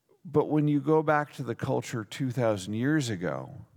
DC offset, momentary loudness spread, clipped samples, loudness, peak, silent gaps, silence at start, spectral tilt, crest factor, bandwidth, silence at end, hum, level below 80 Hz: under 0.1%; 10 LU; under 0.1%; -28 LUFS; -10 dBFS; none; 0.25 s; -6.5 dB/octave; 18 dB; 16 kHz; 0.1 s; none; -68 dBFS